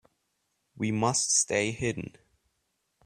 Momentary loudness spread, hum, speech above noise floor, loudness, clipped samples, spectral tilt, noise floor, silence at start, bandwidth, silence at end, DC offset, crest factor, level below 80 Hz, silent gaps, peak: 13 LU; none; 50 dB; -27 LUFS; under 0.1%; -3 dB/octave; -78 dBFS; 0.75 s; 14 kHz; 0.95 s; under 0.1%; 20 dB; -62 dBFS; none; -10 dBFS